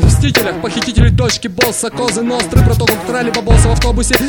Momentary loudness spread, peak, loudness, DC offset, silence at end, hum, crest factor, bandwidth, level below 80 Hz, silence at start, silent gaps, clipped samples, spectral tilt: 5 LU; 0 dBFS; -13 LUFS; under 0.1%; 0 s; none; 12 dB; 19.5 kHz; -18 dBFS; 0 s; none; 0.2%; -4.5 dB/octave